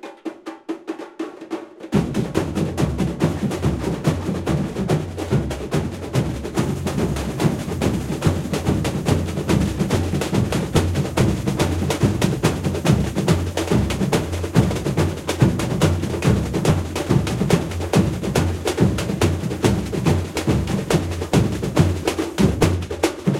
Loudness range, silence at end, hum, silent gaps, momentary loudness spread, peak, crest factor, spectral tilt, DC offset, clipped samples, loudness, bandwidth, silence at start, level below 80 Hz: 3 LU; 0 s; none; none; 5 LU; 0 dBFS; 20 dB; -6 dB/octave; under 0.1%; under 0.1%; -21 LUFS; 16.5 kHz; 0.05 s; -34 dBFS